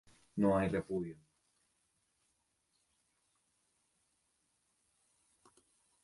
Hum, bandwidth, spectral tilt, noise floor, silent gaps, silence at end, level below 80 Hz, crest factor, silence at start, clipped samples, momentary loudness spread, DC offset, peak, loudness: none; 11.5 kHz; -8 dB/octave; -80 dBFS; none; 4.9 s; -66 dBFS; 22 dB; 0.35 s; under 0.1%; 15 LU; under 0.1%; -20 dBFS; -35 LUFS